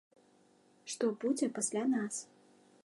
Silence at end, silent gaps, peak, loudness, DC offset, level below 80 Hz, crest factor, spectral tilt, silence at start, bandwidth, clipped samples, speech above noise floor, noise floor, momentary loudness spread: 0.6 s; none; -18 dBFS; -35 LUFS; under 0.1%; under -90 dBFS; 18 dB; -3.5 dB/octave; 0.85 s; 11.5 kHz; under 0.1%; 33 dB; -67 dBFS; 14 LU